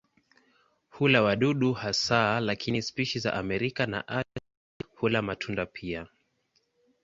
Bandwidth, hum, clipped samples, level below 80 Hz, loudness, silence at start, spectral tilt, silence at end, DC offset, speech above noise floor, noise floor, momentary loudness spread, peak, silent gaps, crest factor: 7.8 kHz; none; under 0.1%; -58 dBFS; -28 LUFS; 0.95 s; -5 dB/octave; 0.95 s; under 0.1%; 45 dB; -73 dBFS; 14 LU; -6 dBFS; 4.57-4.80 s; 24 dB